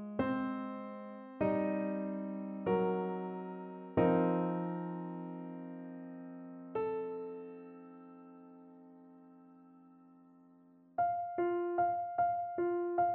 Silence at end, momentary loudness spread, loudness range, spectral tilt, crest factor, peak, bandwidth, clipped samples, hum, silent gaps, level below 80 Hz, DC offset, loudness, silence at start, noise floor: 0 s; 21 LU; 14 LU; -7.5 dB/octave; 20 dB; -16 dBFS; 4.3 kHz; under 0.1%; none; none; -70 dBFS; under 0.1%; -36 LUFS; 0 s; -63 dBFS